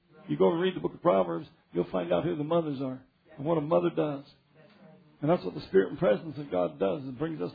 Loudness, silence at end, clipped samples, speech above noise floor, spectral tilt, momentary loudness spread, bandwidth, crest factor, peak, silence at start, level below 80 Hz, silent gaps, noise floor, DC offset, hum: -29 LUFS; 0 s; under 0.1%; 28 dB; -10.5 dB/octave; 10 LU; 5 kHz; 18 dB; -12 dBFS; 0.25 s; -64 dBFS; none; -57 dBFS; under 0.1%; none